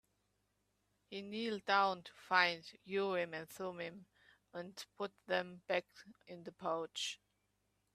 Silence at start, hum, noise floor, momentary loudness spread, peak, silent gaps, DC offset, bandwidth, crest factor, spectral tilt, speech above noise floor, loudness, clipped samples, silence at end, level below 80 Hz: 1.1 s; 50 Hz at -75 dBFS; -82 dBFS; 19 LU; -16 dBFS; none; under 0.1%; 14.5 kHz; 26 dB; -3.5 dB/octave; 42 dB; -39 LUFS; under 0.1%; 0.8 s; -84 dBFS